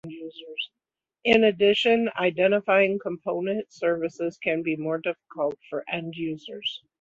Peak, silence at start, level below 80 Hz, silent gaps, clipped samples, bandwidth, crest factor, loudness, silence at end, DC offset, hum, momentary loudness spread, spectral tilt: -6 dBFS; 0.05 s; -66 dBFS; none; under 0.1%; 7.8 kHz; 20 dB; -25 LUFS; 0.25 s; under 0.1%; none; 14 LU; -5.5 dB/octave